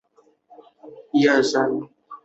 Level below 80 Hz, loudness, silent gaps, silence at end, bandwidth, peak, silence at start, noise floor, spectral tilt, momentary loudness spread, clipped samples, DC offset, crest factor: -70 dBFS; -20 LUFS; none; 0.1 s; 8.2 kHz; -6 dBFS; 0.85 s; -58 dBFS; -4.5 dB/octave; 13 LU; under 0.1%; under 0.1%; 18 dB